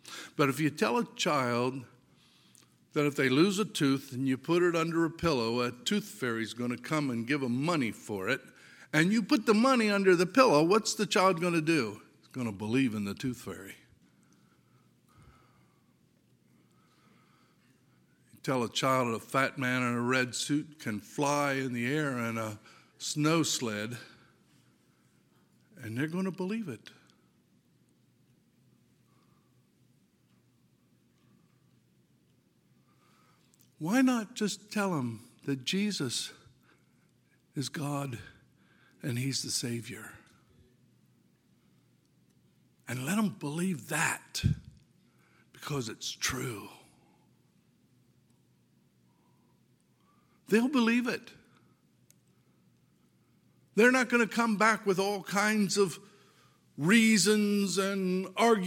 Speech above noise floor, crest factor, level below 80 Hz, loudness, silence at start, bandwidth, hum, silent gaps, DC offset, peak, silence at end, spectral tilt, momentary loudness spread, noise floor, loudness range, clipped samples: 39 dB; 24 dB; -62 dBFS; -30 LUFS; 0.05 s; 17 kHz; none; none; under 0.1%; -8 dBFS; 0 s; -4.5 dB/octave; 15 LU; -68 dBFS; 12 LU; under 0.1%